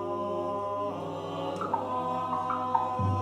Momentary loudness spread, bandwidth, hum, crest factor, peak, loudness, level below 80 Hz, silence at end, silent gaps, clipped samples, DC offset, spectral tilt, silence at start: 6 LU; 11.5 kHz; none; 20 dB; -12 dBFS; -31 LUFS; -68 dBFS; 0 s; none; under 0.1%; under 0.1%; -7.5 dB/octave; 0 s